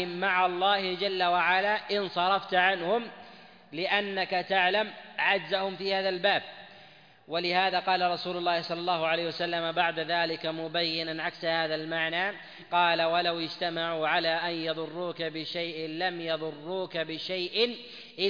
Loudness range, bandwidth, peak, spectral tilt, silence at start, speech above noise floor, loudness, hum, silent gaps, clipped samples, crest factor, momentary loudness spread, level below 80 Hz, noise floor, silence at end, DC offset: 4 LU; 5.2 kHz; -10 dBFS; -5.5 dB/octave; 0 s; 26 dB; -28 LUFS; none; none; under 0.1%; 18 dB; 9 LU; -76 dBFS; -55 dBFS; 0 s; under 0.1%